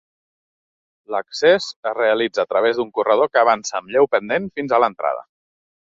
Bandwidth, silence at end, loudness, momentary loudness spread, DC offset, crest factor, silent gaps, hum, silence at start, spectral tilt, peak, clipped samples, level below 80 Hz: 7.8 kHz; 0.65 s; -19 LUFS; 9 LU; under 0.1%; 18 dB; 1.76-1.83 s; none; 1.1 s; -3.5 dB/octave; -2 dBFS; under 0.1%; -64 dBFS